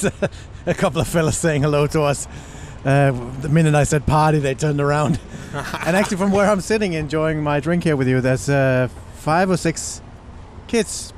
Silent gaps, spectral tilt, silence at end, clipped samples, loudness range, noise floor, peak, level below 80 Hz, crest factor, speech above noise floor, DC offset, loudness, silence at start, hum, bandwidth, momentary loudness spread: none; -6 dB/octave; 0 s; under 0.1%; 2 LU; -38 dBFS; -6 dBFS; -38 dBFS; 14 dB; 19 dB; under 0.1%; -19 LUFS; 0 s; none; 15 kHz; 11 LU